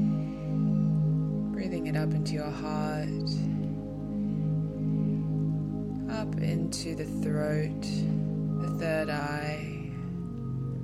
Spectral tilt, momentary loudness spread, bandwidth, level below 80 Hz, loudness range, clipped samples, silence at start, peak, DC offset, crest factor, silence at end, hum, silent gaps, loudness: -7 dB/octave; 6 LU; 12 kHz; -48 dBFS; 2 LU; under 0.1%; 0 s; -18 dBFS; under 0.1%; 12 dB; 0 s; none; none; -31 LUFS